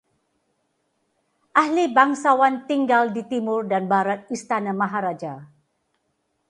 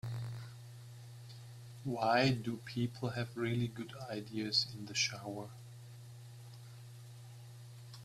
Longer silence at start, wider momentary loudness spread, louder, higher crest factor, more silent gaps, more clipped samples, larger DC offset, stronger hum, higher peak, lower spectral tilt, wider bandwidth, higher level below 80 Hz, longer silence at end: first, 1.55 s vs 0.05 s; second, 10 LU vs 20 LU; first, -21 LUFS vs -37 LUFS; about the same, 20 dB vs 22 dB; neither; neither; neither; neither; first, -2 dBFS vs -16 dBFS; about the same, -5.5 dB/octave vs -4.5 dB/octave; second, 11.5 kHz vs 14.5 kHz; about the same, -74 dBFS vs -70 dBFS; first, 1.05 s vs 0 s